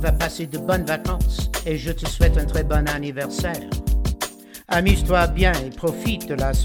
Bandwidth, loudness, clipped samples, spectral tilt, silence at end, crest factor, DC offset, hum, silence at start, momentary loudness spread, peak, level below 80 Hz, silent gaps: 17.5 kHz; -22 LUFS; under 0.1%; -5.5 dB/octave; 0 s; 18 dB; under 0.1%; none; 0 s; 8 LU; -2 dBFS; -24 dBFS; none